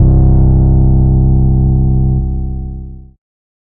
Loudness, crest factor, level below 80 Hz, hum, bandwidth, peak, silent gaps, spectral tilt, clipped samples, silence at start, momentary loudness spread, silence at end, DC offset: -11 LUFS; 10 dB; -12 dBFS; none; 1.5 kHz; 0 dBFS; none; -16.5 dB/octave; under 0.1%; 0 s; 15 LU; 0.75 s; under 0.1%